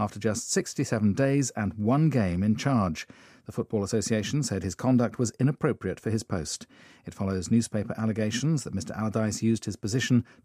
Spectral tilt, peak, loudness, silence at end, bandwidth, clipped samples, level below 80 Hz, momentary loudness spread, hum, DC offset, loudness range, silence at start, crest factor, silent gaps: -5.5 dB/octave; -10 dBFS; -27 LUFS; 0.2 s; 15 kHz; under 0.1%; -60 dBFS; 9 LU; none; under 0.1%; 3 LU; 0 s; 18 dB; none